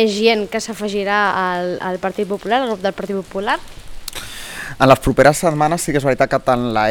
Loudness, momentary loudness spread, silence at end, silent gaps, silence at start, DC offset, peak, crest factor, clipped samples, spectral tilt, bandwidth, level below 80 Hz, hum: -17 LUFS; 16 LU; 0 s; none; 0 s; under 0.1%; 0 dBFS; 18 dB; under 0.1%; -4.5 dB/octave; 19 kHz; -38 dBFS; none